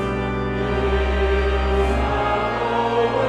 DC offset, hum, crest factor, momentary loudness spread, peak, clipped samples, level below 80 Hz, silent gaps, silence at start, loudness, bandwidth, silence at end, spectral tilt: under 0.1%; none; 12 dB; 4 LU; -8 dBFS; under 0.1%; -26 dBFS; none; 0 s; -21 LUFS; 9.2 kHz; 0 s; -7 dB/octave